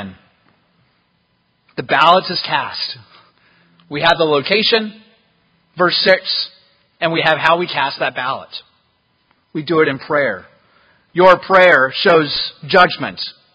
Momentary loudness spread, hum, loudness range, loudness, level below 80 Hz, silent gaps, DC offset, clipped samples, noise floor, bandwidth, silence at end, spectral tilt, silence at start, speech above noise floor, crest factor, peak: 17 LU; none; 6 LU; -14 LUFS; -56 dBFS; none; under 0.1%; under 0.1%; -62 dBFS; 8 kHz; 0.25 s; -5.5 dB/octave; 0 s; 48 dB; 16 dB; 0 dBFS